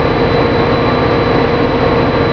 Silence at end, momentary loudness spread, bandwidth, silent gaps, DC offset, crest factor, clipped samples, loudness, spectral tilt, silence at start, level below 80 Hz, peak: 0 s; 0 LU; 5.4 kHz; none; under 0.1%; 12 dB; under 0.1%; -12 LUFS; -8 dB/octave; 0 s; -26 dBFS; 0 dBFS